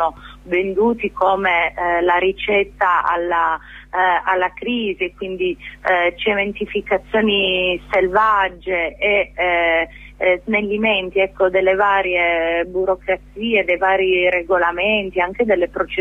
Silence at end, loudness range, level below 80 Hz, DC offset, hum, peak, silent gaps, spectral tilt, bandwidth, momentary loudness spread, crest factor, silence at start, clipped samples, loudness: 0 s; 2 LU; -44 dBFS; under 0.1%; none; -4 dBFS; none; -6 dB/octave; 6.8 kHz; 7 LU; 14 dB; 0 s; under 0.1%; -18 LUFS